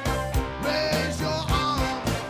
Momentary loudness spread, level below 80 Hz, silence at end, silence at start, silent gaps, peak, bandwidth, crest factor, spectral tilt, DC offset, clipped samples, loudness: 3 LU; -34 dBFS; 0 s; 0 s; none; -12 dBFS; 18 kHz; 14 dB; -4.5 dB/octave; under 0.1%; under 0.1%; -26 LUFS